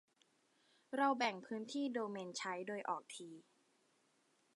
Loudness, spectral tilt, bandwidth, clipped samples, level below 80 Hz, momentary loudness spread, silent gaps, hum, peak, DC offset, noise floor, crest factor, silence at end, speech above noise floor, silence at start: -41 LUFS; -3.5 dB/octave; 11.5 kHz; under 0.1%; under -90 dBFS; 16 LU; none; none; -22 dBFS; under 0.1%; -77 dBFS; 22 dB; 1.15 s; 36 dB; 0.9 s